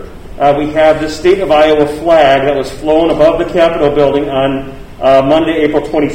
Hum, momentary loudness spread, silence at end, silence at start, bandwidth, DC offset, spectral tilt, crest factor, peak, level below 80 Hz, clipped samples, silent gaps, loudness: none; 6 LU; 0 s; 0 s; 15.5 kHz; under 0.1%; -6 dB/octave; 10 dB; 0 dBFS; -32 dBFS; 0.2%; none; -10 LUFS